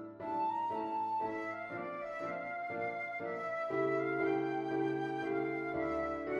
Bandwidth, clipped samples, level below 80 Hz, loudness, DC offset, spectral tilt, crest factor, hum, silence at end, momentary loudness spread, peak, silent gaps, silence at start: 7.6 kHz; under 0.1%; -68 dBFS; -37 LUFS; under 0.1%; -7.5 dB/octave; 14 dB; none; 0 s; 7 LU; -24 dBFS; none; 0 s